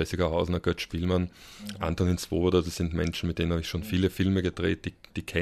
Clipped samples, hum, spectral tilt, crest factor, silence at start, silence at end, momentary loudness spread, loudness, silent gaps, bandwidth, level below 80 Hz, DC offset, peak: under 0.1%; none; -6 dB/octave; 18 dB; 0 s; 0 s; 9 LU; -29 LUFS; none; 14 kHz; -42 dBFS; under 0.1%; -10 dBFS